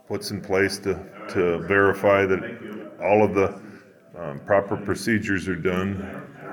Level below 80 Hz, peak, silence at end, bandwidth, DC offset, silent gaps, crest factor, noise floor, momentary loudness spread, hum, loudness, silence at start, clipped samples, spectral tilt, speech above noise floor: -56 dBFS; -6 dBFS; 0 s; over 20 kHz; under 0.1%; none; 18 dB; -46 dBFS; 16 LU; none; -23 LUFS; 0.1 s; under 0.1%; -6 dB/octave; 23 dB